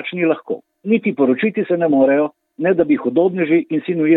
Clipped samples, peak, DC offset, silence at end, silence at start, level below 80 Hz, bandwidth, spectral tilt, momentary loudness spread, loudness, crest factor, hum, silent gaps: under 0.1%; -2 dBFS; under 0.1%; 0 s; 0 s; -64 dBFS; 4.1 kHz; -10.5 dB/octave; 8 LU; -17 LUFS; 14 dB; none; none